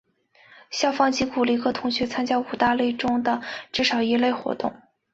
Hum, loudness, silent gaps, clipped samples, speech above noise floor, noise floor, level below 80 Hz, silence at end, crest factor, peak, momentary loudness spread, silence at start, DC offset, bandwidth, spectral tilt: none; -23 LUFS; none; under 0.1%; 33 dB; -56 dBFS; -58 dBFS; 0.4 s; 18 dB; -6 dBFS; 7 LU; 0.7 s; under 0.1%; 7.8 kHz; -3.5 dB/octave